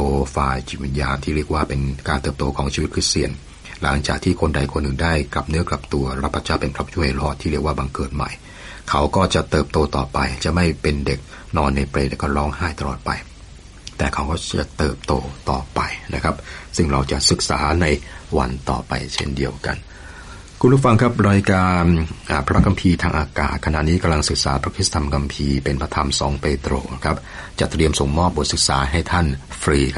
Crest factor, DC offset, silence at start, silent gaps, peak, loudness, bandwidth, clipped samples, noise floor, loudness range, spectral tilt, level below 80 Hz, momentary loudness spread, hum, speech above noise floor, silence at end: 18 dB; under 0.1%; 0 s; none; -2 dBFS; -20 LUFS; 11.5 kHz; under 0.1%; -40 dBFS; 6 LU; -5 dB/octave; -28 dBFS; 9 LU; none; 20 dB; 0 s